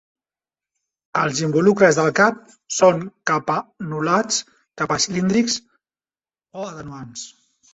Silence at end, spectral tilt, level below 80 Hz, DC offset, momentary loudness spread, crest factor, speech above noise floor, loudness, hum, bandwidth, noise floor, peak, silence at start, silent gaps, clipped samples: 0.45 s; -4 dB/octave; -60 dBFS; under 0.1%; 19 LU; 20 dB; over 71 dB; -19 LUFS; none; 8.4 kHz; under -90 dBFS; -2 dBFS; 1.15 s; none; under 0.1%